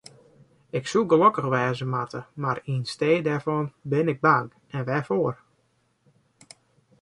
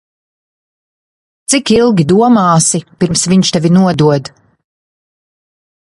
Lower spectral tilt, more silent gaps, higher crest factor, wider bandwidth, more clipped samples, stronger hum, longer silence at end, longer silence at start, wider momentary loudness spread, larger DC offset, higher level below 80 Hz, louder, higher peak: first, -6.5 dB/octave vs -5 dB/octave; neither; first, 20 dB vs 12 dB; about the same, 11.5 kHz vs 11.5 kHz; neither; neither; about the same, 1.65 s vs 1.65 s; second, 0.75 s vs 1.5 s; first, 12 LU vs 6 LU; neither; second, -66 dBFS vs -46 dBFS; second, -25 LUFS vs -10 LUFS; second, -6 dBFS vs 0 dBFS